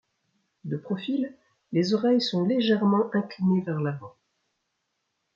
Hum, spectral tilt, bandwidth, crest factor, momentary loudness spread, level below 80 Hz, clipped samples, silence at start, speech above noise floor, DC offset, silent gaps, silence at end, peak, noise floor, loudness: none; -7 dB/octave; 7.4 kHz; 16 dB; 12 LU; -72 dBFS; under 0.1%; 0.65 s; 53 dB; under 0.1%; none; 1.25 s; -12 dBFS; -78 dBFS; -26 LUFS